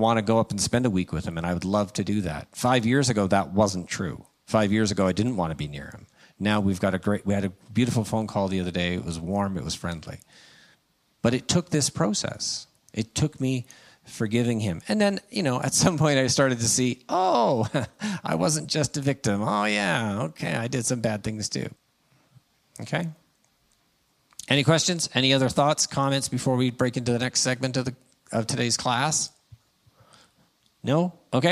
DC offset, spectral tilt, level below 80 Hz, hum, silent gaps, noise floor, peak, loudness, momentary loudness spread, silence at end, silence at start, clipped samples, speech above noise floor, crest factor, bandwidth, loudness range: under 0.1%; -4.5 dB/octave; -56 dBFS; none; none; -68 dBFS; -4 dBFS; -25 LUFS; 10 LU; 0 s; 0 s; under 0.1%; 43 dB; 22 dB; 15 kHz; 6 LU